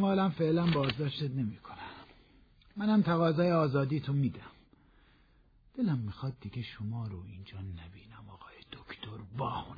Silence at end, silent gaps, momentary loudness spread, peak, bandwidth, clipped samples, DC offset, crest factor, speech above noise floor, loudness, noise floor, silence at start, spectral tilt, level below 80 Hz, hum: 0 s; none; 22 LU; -16 dBFS; 5 kHz; under 0.1%; under 0.1%; 16 dB; 32 dB; -32 LUFS; -64 dBFS; 0 s; -9.5 dB/octave; -60 dBFS; none